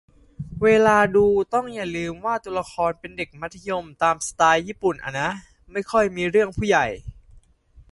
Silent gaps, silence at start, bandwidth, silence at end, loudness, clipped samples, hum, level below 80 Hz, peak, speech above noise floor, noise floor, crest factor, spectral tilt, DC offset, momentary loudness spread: none; 0.4 s; 11.5 kHz; 0.1 s; -22 LUFS; under 0.1%; none; -48 dBFS; -4 dBFS; 31 dB; -53 dBFS; 20 dB; -4.5 dB/octave; under 0.1%; 15 LU